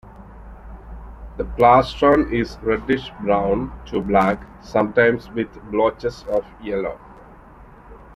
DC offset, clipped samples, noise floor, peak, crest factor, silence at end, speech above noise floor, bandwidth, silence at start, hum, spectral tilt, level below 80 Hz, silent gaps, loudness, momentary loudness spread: under 0.1%; under 0.1%; -44 dBFS; -2 dBFS; 20 dB; 0 s; 25 dB; 12 kHz; 0.05 s; none; -7 dB/octave; -40 dBFS; none; -20 LUFS; 23 LU